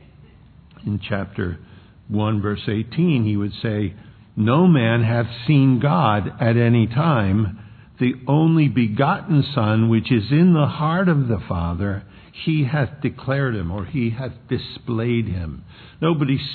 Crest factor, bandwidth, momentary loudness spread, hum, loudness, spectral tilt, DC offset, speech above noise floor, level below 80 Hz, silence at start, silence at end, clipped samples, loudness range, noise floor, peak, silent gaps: 16 dB; 4.6 kHz; 11 LU; none; -20 LUFS; -11 dB/octave; under 0.1%; 28 dB; -46 dBFS; 0.85 s; 0 s; under 0.1%; 6 LU; -47 dBFS; -2 dBFS; none